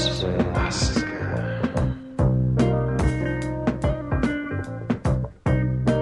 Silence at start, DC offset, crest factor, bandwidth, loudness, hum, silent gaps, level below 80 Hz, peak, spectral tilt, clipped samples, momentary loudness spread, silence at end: 0 s; under 0.1%; 16 dB; 11 kHz; -24 LUFS; none; none; -32 dBFS; -6 dBFS; -6 dB/octave; under 0.1%; 6 LU; 0 s